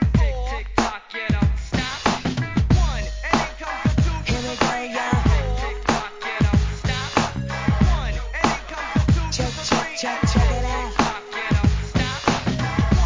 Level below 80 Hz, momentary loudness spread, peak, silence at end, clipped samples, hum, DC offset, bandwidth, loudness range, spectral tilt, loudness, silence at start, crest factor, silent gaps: -26 dBFS; 5 LU; -4 dBFS; 0 s; under 0.1%; none; 0.2%; 7.6 kHz; 1 LU; -5.5 dB/octave; -22 LUFS; 0 s; 16 dB; none